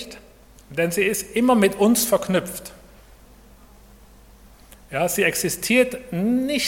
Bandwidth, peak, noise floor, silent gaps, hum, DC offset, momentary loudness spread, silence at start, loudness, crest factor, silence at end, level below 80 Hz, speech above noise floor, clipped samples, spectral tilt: 17.5 kHz; -4 dBFS; -49 dBFS; none; none; under 0.1%; 14 LU; 0 s; -20 LUFS; 18 dB; 0 s; -50 dBFS; 28 dB; under 0.1%; -4 dB/octave